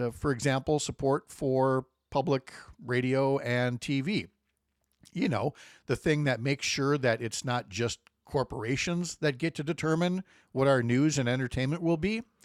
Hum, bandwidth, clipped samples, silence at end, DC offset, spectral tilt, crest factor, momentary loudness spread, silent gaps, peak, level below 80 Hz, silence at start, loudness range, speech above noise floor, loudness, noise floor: none; 14 kHz; under 0.1%; 0.2 s; under 0.1%; -5.5 dB/octave; 18 dB; 7 LU; none; -12 dBFS; -56 dBFS; 0 s; 3 LU; 49 dB; -30 LUFS; -79 dBFS